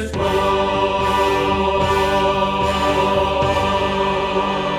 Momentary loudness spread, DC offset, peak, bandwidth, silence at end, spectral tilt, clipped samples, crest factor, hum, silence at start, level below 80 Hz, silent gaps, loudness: 2 LU; under 0.1%; -6 dBFS; 15.5 kHz; 0 s; -5 dB/octave; under 0.1%; 12 dB; 50 Hz at -45 dBFS; 0 s; -34 dBFS; none; -18 LUFS